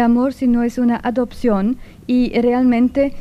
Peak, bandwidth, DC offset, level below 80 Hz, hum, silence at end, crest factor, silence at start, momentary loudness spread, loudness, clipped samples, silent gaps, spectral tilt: -6 dBFS; 8 kHz; under 0.1%; -38 dBFS; none; 0 s; 10 dB; 0 s; 5 LU; -17 LUFS; under 0.1%; none; -7.5 dB/octave